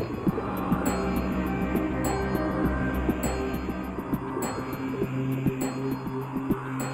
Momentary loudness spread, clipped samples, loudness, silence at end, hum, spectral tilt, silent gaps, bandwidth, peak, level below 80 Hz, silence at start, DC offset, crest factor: 5 LU; under 0.1%; -29 LUFS; 0 s; none; -6.5 dB/octave; none; 16.5 kHz; -12 dBFS; -38 dBFS; 0 s; under 0.1%; 16 dB